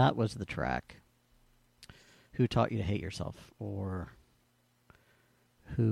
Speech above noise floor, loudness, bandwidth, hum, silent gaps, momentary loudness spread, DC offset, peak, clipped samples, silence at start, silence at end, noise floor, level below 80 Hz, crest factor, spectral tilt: 39 dB; -35 LUFS; 12 kHz; none; none; 23 LU; under 0.1%; -14 dBFS; under 0.1%; 0 s; 0 s; -71 dBFS; -54 dBFS; 22 dB; -7 dB/octave